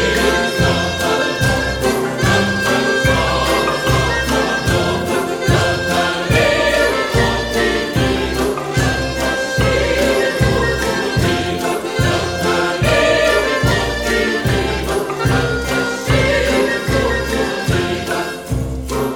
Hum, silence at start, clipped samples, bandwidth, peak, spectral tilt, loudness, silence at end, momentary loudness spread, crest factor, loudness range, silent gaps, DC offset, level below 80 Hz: none; 0 s; under 0.1%; 19 kHz; 0 dBFS; -4.5 dB/octave; -16 LUFS; 0 s; 4 LU; 16 dB; 1 LU; none; 0.1%; -28 dBFS